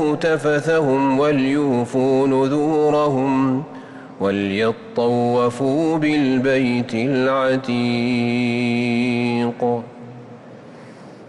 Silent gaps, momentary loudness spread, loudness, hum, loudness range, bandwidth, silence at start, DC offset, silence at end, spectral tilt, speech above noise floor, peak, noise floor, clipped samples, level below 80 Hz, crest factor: none; 6 LU; -19 LUFS; none; 3 LU; 11 kHz; 0 s; under 0.1%; 0 s; -7 dB/octave; 21 dB; -8 dBFS; -39 dBFS; under 0.1%; -56 dBFS; 10 dB